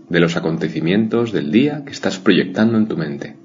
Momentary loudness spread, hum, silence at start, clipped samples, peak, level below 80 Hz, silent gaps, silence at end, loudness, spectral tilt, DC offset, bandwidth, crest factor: 8 LU; none; 0.1 s; under 0.1%; 0 dBFS; -56 dBFS; none; 0.1 s; -18 LUFS; -6.5 dB/octave; under 0.1%; 7.6 kHz; 18 dB